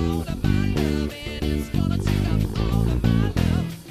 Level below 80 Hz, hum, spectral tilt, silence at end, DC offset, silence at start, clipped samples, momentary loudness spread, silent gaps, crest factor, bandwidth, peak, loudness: -30 dBFS; none; -7 dB/octave; 0 s; under 0.1%; 0 s; under 0.1%; 5 LU; none; 14 dB; 15.5 kHz; -8 dBFS; -23 LUFS